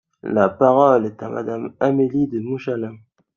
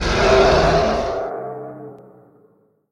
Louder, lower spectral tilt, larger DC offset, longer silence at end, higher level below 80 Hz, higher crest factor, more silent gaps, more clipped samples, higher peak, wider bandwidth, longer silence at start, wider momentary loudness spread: about the same, -19 LUFS vs -17 LUFS; first, -9 dB/octave vs -5 dB/octave; neither; second, 0.4 s vs 0.95 s; second, -62 dBFS vs -30 dBFS; about the same, 18 dB vs 18 dB; neither; neither; about the same, -2 dBFS vs -2 dBFS; second, 7 kHz vs 11.5 kHz; first, 0.25 s vs 0 s; second, 13 LU vs 22 LU